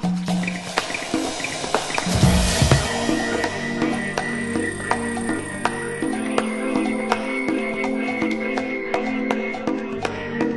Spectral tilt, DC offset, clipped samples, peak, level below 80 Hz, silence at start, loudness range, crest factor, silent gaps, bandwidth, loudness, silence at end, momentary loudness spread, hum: -4.5 dB/octave; under 0.1%; under 0.1%; 0 dBFS; -36 dBFS; 0 s; 3 LU; 22 dB; none; 12 kHz; -23 LUFS; 0 s; 7 LU; none